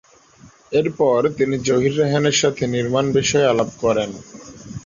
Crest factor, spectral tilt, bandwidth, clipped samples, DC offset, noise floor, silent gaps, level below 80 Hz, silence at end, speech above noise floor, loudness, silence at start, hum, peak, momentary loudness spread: 14 dB; -4.5 dB/octave; 7.6 kHz; under 0.1%; under 0.1%; -48 dBFS; none; -50 dBFS; 0.05 s; 30 dB; -18 LUFS; 0.7 s; none; -4 dBFS; 12 LU